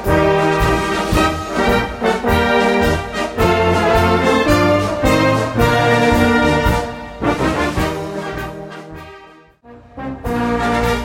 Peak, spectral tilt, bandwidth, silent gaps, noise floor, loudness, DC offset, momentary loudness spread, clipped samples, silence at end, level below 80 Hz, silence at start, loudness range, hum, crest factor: 0 dBFS; -5.5 dB/octave; 16.5 kHz; none; -43 dBFS; -15 LUFS; under 0.1%; 13 LU; under 0.1%; 0 s; -28 dBFS; 0 s; 9 LU; none; 14 dB